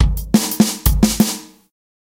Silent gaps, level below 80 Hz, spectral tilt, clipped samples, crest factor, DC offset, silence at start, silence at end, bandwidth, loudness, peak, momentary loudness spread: none; -24 dBFS; -4.5 dB/octave; under 0.1%; 16 dB; under 0.1%; 0 s; 0.7 s; 17 kHz; -16 LUFS; 0 dBFS; 4 LU